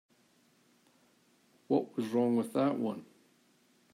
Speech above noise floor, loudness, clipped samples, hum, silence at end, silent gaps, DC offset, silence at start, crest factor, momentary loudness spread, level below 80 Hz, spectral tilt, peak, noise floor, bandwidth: 37 dB; -32 LUFS; under 0.1%; none; 0.9 s; none; under 0.1%; 1.7 s; 20 dB; 7 LU; -86 dBFS; -7.5 dB/octave; -16 dBFS; -69 dBFS; 15 kHz